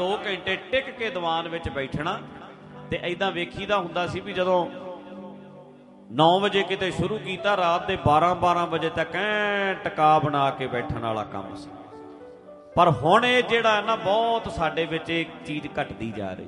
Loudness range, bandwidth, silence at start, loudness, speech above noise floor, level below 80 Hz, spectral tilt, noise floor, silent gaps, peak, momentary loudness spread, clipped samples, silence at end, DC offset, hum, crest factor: 6 LU; 11.5 kHz; 0 s; -24 LUFS; 24 dB; -52 dBFS; -5.5 dB/octave; -48 dBFS; none; -4 dBFS; 19 LU; under 0.1%; 0 s; under 0.1%; none; 20 dB